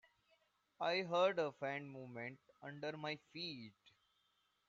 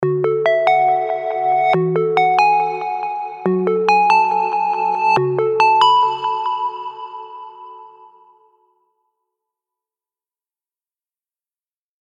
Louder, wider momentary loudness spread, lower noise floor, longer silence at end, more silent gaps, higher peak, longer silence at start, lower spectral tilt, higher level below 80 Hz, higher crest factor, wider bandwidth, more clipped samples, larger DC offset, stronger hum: second, -42 LUFS vs -16 LUFS; first, 18 LU vs 15 LU; second, -81 dBFS vs under -90 dBFS; second, 0.8 s vs 4.15 s; neither; second, -24 dBFS vs -2 dBFS; first, 0.8 s vs 0 s; second, -2.5 dB/octave vs -6 dB/octave; second, -88 dBFS vs -74 dBFS; about the same, 22 dB vs 18 dB; second, 7.4 kHz vs 9.4 kHz; neither; neither; neither